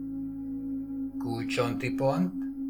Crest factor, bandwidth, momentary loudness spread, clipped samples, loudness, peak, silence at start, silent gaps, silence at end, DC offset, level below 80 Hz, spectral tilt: 16 dB; 16 kHz; 9 LU; under 0.1%; -31 LUFS; -14 dBFS; 0 s; none; 0 s; under 0.1%; -56 dBFS; -6.5 dB/octave